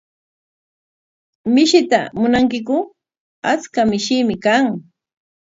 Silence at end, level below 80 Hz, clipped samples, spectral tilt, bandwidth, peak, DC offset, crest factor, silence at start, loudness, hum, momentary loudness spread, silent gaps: 0.7 s; -54 dBFS; under 0.1%; -4.5 dB/octave; 7.8 kHz; 0 dBFS; under 0.1%; 18 dB; 1.45 s; -16 LUFS; none; 11 LU; 3.20-3.42 s